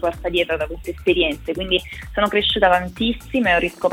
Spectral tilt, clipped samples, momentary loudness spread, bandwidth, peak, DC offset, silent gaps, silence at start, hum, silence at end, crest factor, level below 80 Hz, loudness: -5 dB/octave; under 0.1%; 8 LU; 16.5 kHz; -2 dBFS; under 0.1%; none; 0 s; none; 0 s; 18 dB; -36 dBFS; -20 LUFS